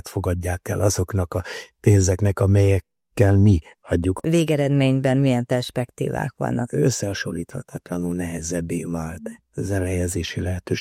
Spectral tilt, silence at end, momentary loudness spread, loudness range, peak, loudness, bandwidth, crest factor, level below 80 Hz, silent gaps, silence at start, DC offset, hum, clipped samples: -6 dB/octave; 0 s; 12 LU; 7 LU; -2 dBFS; -22 LUFS; 15 kHz; 18 dB; -46 dBFS; none; 0.05 s; under 0.1%; none; under 0.1%